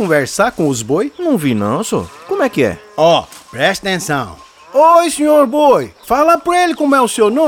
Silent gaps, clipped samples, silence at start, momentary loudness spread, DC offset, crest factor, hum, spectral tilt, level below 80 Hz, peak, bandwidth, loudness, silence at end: none; under 0.1%; 0 s; 8 LU; under 0.1%; 12 dB; none; -4.5 dB/octave; -48 dBFS; -2 dBFS; 18.5 kHz; -13 LUFS; 0 s